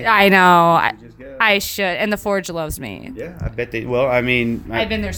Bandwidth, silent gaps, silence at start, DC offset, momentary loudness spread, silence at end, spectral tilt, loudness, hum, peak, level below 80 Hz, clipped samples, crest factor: 19 kHz; none; 0 s; under 0.1%; 18 LU; 0 s; -4.5 dB/octave; -16 LUFS; none; 0 dBFS; -40 dBFS; under 0.1%; 18 dB